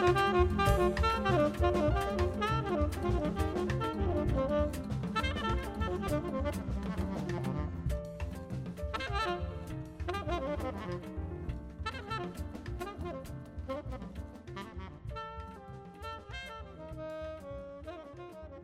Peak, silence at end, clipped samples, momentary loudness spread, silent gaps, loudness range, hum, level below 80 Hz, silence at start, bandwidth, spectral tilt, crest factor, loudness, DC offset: -14 dBFS; 0 s; under 0.1%; 16 LU; none; 13 LU; none; -42 dBFS; 0 s; 15.5 kHz; -6.5 dB/octave; 20 dB; -35 LUFS; under 0.1%